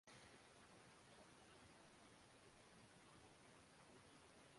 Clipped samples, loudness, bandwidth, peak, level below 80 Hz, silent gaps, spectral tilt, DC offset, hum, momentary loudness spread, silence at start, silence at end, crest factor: under 0.1%; -67 LUFS; 11.5 kHz; -52 dBFS; -84 dBFS; none; -3.5 dB/octave; under 0.1%; none; 2 LU; 0.05 s; 0 s; 16 dB